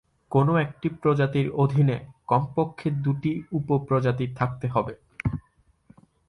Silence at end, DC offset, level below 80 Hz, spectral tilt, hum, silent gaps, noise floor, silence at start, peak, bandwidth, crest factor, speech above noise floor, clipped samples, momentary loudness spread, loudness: 0.9 s; under 0.1%; -52 dBFS; -9.5 dB/octave; none; none; -63 dBFS; 0.3 s; -8 dBFS; 6 kHz; 18 dB; 39 dB; under 0.1%; 9 LU; -25 LUFS